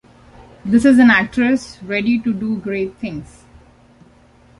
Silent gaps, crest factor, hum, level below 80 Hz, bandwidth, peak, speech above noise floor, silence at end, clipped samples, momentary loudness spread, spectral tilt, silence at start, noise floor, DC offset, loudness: none; 16 dB; none; -48 dBFS; 11.5 kHz; 0 dBFS; 33 dB; 1.35 s; under 0.1%; 18 LU; -6 dB/octave; 0.65 s; -49 dBFS; under 0.1%; -16 LUFS